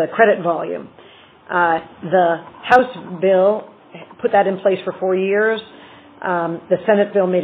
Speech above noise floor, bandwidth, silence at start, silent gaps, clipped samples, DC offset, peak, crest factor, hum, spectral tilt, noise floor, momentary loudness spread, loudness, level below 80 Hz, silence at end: 27 dB; 4.6 kHz; 0 s; none; under 0.1%; under 0.1%; 0 dBFS; 18 dB; none; -4 dB/octave; -44 dBFS; 10 LU; -18 LUFS; -64 dBFS; 0 s